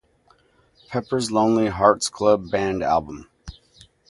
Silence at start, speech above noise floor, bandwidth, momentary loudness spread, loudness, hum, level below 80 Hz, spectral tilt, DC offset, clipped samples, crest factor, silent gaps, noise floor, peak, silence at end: 0.9 s; 39 dB; 11.5 kHz; 12 LU; -21 LUFS; none; -48 dBFS; -5 dB/octave; under 0.1%; under 0.1%; 22 dB; none; -59 dBFS; 0 dBFS; 0.6 s